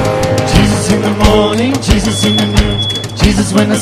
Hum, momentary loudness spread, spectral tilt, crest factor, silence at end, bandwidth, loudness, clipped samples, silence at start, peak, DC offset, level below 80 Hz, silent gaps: none; 3 LU; -5 dB/octave; 10 dB; 0 s; 15.5 kHz; -11 LUFS; 0.5%; 0 s; 0 dBFS; under 0.1%; -20 dBFS; none